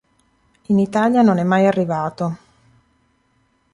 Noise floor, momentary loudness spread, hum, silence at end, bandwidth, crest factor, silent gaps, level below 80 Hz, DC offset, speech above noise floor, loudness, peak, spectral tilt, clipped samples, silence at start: -63 dBFS; 11 LU; none; 1.35 s; 11 kHz; 16 dB; none; -60 dBFS; under 0.1%; 46 dB; -17 LUFS; -4 dBFS; -8 dB/octave; under 0.1%; 0.7 s